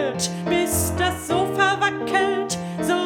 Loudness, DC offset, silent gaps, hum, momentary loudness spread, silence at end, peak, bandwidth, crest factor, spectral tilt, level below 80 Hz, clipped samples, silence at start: -22 LUFS; under 0.1%; none; none; 6 LU; 0 s; -4 dBFS; over 20 kHz; 18 dB; -3.5 dB/octave; -44 dBFS; under 0.1%; 0 s